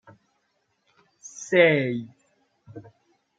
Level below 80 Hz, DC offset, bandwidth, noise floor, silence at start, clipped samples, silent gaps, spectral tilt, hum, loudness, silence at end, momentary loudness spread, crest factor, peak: -76 dBFS; under 0.1%; 7.8 kHz; -72 dBFS; 1.35 s; under 0.1%; none; -5 dB/octave; none; -21 LUFS; 0.6 s; 28 LU; 22 dB; -4 dBFS